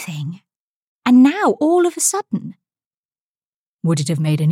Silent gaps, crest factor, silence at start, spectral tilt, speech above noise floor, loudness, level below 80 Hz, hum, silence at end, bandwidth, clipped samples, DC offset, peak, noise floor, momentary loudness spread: 0.56-1.02 s, 2.86-3.09 s, 3.18-3.79 s; 14 dB; 0 s; -5.5 dB/octave; over 74 dB; -17 LUFS; -68 dBFS; none; 0 s; 16 kHz; under 0.1%; under 0.1%; -4 dBFS; under -90 dBFS; 16 LU